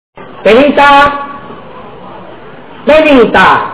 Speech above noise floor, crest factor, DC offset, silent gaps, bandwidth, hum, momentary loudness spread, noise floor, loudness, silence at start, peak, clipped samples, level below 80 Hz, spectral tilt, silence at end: 25 dB; 8 dB; 2%; none; 4 kHz; none; 22 LU; -30 dBFS; -6 LUFS; 0.15 s; 0 dBFS; 4%; -36 dBFS; -8.5 dB/octave; 0 s